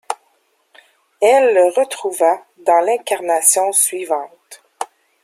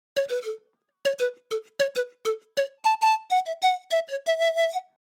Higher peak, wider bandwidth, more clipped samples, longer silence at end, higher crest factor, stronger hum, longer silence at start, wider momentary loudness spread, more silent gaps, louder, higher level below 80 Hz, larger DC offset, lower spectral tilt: first, 0 dBFS vs -12 dBFS; second, 16 kHz vs 18.5 kHz; neither; about the same, 0.4 s vs 0.3 s; about the same, 18 dB vs 14 dB; neither; about the same, 0.1 s vs 0.15 s; first, 18 LU vs 10 LU; neither; first, -15 LUFS vs -26 LUFS; first, -72 dBFS vs -90 dBFS; neither; about the same, -0.5 dB/octave vs 0 dB/octave